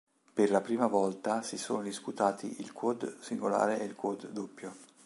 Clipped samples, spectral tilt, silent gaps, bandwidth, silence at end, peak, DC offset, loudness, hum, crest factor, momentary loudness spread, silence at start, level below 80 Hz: under 0.1%; -5 dB/octave; none; 11.5 kHz; 0.2 s; -12 dBFS; under 0.1%; -33 LUFS; none; 20 dB; 13 LU; 0.35 s; -80 dBFS